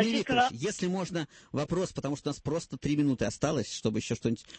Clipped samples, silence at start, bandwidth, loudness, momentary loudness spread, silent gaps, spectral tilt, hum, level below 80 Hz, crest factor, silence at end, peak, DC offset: under 0.1%; 0 s; 8.8 kHz; -31 LUFS; 8 LU; none; -5 dB/octave; none; -56 dBFS; 18 dB; 0 s; -12 dBFS; under 0.1%